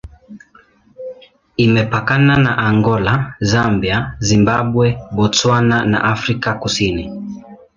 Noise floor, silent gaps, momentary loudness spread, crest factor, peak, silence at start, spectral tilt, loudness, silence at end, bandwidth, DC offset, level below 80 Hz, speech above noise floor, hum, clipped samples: -49 dBFS; none; 15 LU; 14 dB; -2 dBFS; 0.05 s; -5.5 dB/octave; -15 LUFS; 0.2 s; 7.6 kHz; under 0.1%; -38 dBFS; 35 dB; none; under 0.1%